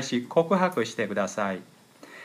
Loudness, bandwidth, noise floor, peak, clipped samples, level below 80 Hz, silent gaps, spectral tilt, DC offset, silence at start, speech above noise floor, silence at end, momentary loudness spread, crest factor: -26 LUFS; 15.5 kHz; -49 dBFS; -8 dBFS; under 0.1%; -78 dBFS; none; -5 dB/octave; under 0.1%; 0 s; 22 dB; 0 s; 7 LU; 20 dB